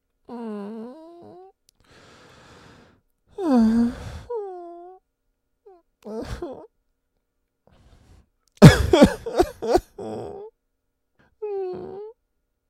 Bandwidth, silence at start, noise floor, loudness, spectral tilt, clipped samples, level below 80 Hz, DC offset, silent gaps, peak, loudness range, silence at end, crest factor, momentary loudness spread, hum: 16 kHz; 0.3 s; -75 dBFS; -19 LUFS; -7 dB/octave; under 0.1%; -40 dBFS; under 0.1%; none; 0 dBFS; 22 LU; 0.6 s; 24 dB; 27 LU; none